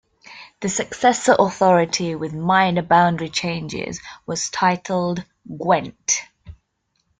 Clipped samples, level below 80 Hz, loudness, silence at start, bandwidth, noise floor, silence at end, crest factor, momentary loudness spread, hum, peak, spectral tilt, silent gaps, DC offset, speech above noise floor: under 0.1%; -56 dBFS; -20 LUFS; 0.3 s; 9.6 kHz; -70 dBFS; 0.65 s; 18 dB; 13 LU; none; -2 dBFS; -4 dB/octave; none; under 0.1%; 51 dB